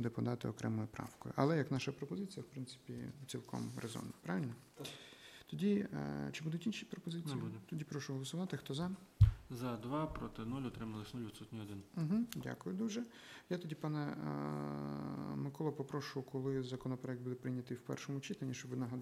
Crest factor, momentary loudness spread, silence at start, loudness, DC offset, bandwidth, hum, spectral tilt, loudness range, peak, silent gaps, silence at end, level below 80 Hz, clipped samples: 24 dB; 12 LU; 0 s; -42 LUFS; under 0.1%; 15.5 kHz; none; -6.5 dB/octave; 4 LU; -16 dBFS; none; 0 s; -54 dBFS; under 0.1%